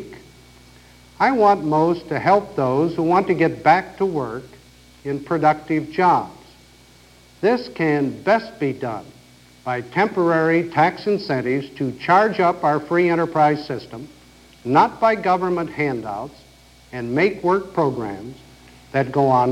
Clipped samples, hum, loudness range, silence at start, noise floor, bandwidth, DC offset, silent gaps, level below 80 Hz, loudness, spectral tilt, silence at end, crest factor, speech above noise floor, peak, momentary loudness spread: under 0.1%; none; 4 LU; 0 s; -49 dBFS; 14 kHz; under 0.1%; none; -54 dBFS; -20 LUFS; -7 dB/octave; 0 s; 18 dB; 30 dB; -2 dBFS; 14 LU